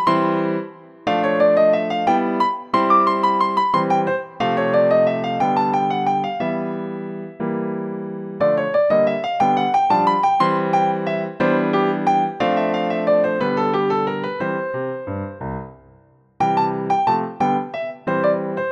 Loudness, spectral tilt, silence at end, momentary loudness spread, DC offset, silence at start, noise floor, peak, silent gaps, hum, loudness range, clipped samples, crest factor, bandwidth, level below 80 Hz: -19 LUFS; -7 dB/octave; 0 s; 11 LU; under 0.1%; 0 s; -53 dBFS; -4 dBFS; none; none; 5 LU; under 0.1%; 16 dB; 8.2 kHz; -58 dBFS